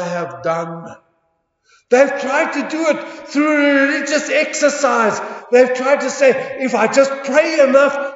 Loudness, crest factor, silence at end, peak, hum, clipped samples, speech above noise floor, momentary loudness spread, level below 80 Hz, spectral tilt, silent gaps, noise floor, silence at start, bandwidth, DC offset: -15 LUFS; 16 dB; 0 s; 0 dBFS; none; under 0.1%; 51 dB; 9 LU; -68 dBFS; -3.5 dB/octave; none; -66 dBFS; 0 s; 8 kHz; under 0.1%